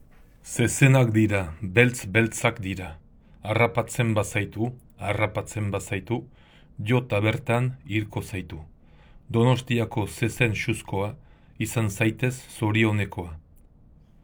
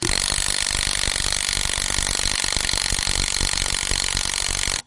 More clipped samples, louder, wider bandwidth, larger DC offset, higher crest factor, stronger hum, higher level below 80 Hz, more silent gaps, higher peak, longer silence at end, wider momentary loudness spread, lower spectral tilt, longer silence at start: neither; second, -25 LUFS vs -20 LUFS; first, over 20 kHz vs 11.5 kHz; neither; about the same, 24 dB vs 20 dB; neither; second, -52 dBFS vs -32 dBFS; neither; about the same, -2 dBFS vs -4 dBFS; first, 0.85 s vs 0.05 s; first, 13 LU vs 1 LU; first, -5.5 dB/octave vs -0.5 dB/octave; first, 0.45 s vs 0 s